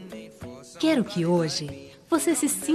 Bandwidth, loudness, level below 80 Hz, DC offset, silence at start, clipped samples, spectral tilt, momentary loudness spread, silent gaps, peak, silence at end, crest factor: 13 kHz; -25 LUFS; -62 dBFS; under 0.1%; 0 s; under 0.1%; -4.5 dB/octave; 18 LU; none; -10 dBFS; 0 s; 16 dB